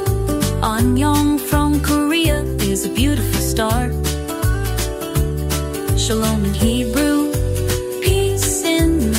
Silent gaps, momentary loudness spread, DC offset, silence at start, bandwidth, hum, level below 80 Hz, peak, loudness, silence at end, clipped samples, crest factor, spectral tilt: none; 5 LU; under 0.1%; 0 s; 16.5 kHz; none; -24 dBFS; -4 dBFS; -18 LUFS; 0 s; under 0.1%; 14 dB; -5 dB/octave